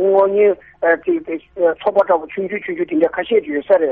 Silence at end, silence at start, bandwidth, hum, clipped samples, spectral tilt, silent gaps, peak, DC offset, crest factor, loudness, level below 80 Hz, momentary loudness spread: 0 s; 0 s; 4.4 kHz; none; under 0.1%; -4 dB/octave; none; -2 dBFS; under 0.1%; 14 dB; -17 LUFS; -56 dBFS; 9 LU